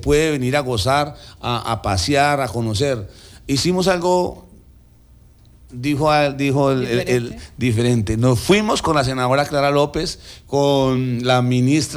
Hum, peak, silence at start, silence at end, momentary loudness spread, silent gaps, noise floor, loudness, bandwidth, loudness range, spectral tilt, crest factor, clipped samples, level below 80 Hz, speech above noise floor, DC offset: none; -4 dBFS; 0 s; 0 s; 9 LU; none; -48 dBFS; -18 LUFS; over 20 kHz; 3 LU; -5.5 dB/octave; 14 dB; under 0.1%; -40 dBFS; 30 dB; under 0.1%